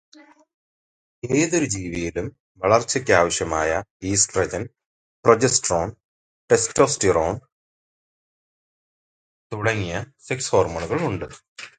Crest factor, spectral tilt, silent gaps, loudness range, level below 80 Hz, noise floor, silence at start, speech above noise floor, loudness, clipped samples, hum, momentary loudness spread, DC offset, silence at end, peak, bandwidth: 22 dB; -3.5 dB/octave; 2.40-2.55 s, 3.90-4.00 s, 4.86-5.23 s, 6.04-6.48 s, 7.52-9.50 s, 11.48-11.56 s; 6 LU; -46 dBFS; under -90 dBFS; 1.25 s; over 68 dB; -21 LUFS; under 0.1%; none; 14 LU; under 0.1%; 0.1 s; 0 dBFS; 9.6 kHz